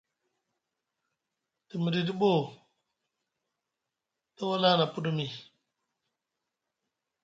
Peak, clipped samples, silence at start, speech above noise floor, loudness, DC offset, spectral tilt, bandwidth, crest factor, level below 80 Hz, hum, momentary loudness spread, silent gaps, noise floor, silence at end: -10 dBFS; under 0.1%; 1.75 s; 59 dB; -29 LUFS; under 0.1%; -7 dB/octave; 7.6 kHz; 22 dB; -76 dBFS; none; 16 LU; none; -87 dBFS; 1.8 s